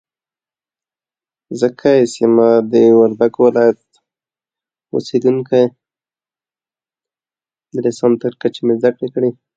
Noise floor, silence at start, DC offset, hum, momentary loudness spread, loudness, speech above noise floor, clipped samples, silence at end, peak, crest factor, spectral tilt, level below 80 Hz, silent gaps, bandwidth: under -90 dBFS; 1.5 s; under 0.1%; none; 10 LU; -14 LUFS; over 77 dB; under 0.1%; 0.25 s; 0 dBFS; 16 dB; -7 dB/octave; -62 dBFS; none; 9.2 kHz